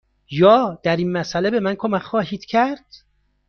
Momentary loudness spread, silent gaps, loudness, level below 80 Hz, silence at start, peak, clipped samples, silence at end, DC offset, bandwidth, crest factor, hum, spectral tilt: 10 LU; none; -19 LUFS; -56 dBFS; 0.3 s; -2 dBFS; under 0.1%; 0.5 s; under 0.1%; 6.8 kHz; 18 dB; 50 Hz at -55 dBFS; -6.5 dB/octave